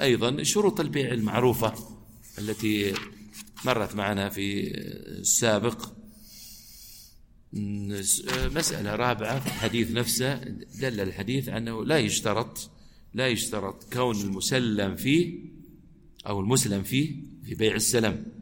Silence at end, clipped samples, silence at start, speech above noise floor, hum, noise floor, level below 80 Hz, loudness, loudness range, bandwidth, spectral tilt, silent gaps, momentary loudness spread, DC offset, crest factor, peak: 0 s; under 0.1%; 0 s; 26 dB; none; -53 dBFS; -48 dBFS; -27 LUFS; 2 LU; 17 kHz; -4 dB/octave; none; 18 LU; under 0.1%; 20 dB; -8 dBFS